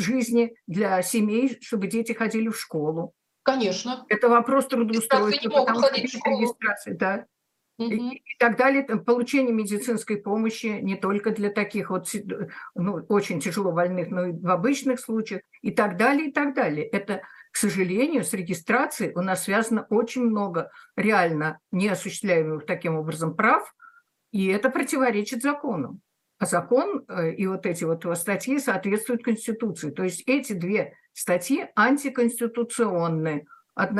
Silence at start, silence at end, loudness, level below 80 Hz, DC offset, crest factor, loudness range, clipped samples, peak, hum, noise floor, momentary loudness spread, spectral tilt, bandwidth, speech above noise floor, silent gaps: 0 s; 0 s; -25 LUFS; -74 dBFS; under 0.1%; 20 dB; 4 LU; under 0.1%; -4 dBFS; none; -54 dBFS; 8 LU; -5 dB/octave; 13 kHz; 30 dB; none